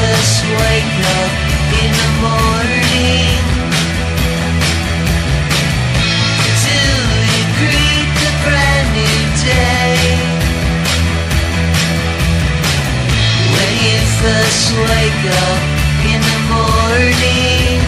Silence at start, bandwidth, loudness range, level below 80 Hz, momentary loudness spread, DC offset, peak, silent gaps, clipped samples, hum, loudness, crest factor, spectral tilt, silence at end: 0 s; 15 kHz; 2 LU; -20 dBFS; 4 LU; under 0.1%; 0 dBFS; none; under 0.1%; none; -12 LUFS; 12 dB; -4 dB/octave; 0 s